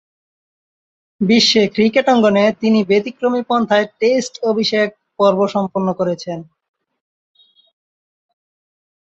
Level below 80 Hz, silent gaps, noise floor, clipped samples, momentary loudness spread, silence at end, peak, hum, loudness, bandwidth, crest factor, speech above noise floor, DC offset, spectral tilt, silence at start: -60 dBFS; none; under -90 dBFS; under 0.1%; 8 LU; 2.75 s; -2 dBFS; none; -15 LUFS; 7.8 kHz; 16 dB; over 75 dB; under 0.1%; -5 dB/octave; 1.2 s